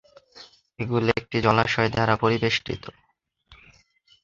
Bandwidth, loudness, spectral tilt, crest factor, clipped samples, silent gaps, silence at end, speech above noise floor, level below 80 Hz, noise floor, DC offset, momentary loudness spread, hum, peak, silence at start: 7.6 kHz; -23 LUFS; -6 dB/octave; 24 dB; under 0.1%; none; 0.7 s; 37 dB; -52 dBFS; -60 dBFS; under 0.1%; 14 LU; none; -2 dBFS; 0.35 s